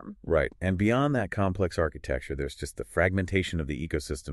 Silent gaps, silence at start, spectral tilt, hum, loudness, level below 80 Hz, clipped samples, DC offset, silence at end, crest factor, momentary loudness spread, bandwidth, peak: none; 0 s; -6.5 dB/octave; none; -29 LUFS; -42 dBFS; under 0.1%; under 0.1%; 0 s; 18 dB; 9 LU; 12.5 kHz; -10 dBFS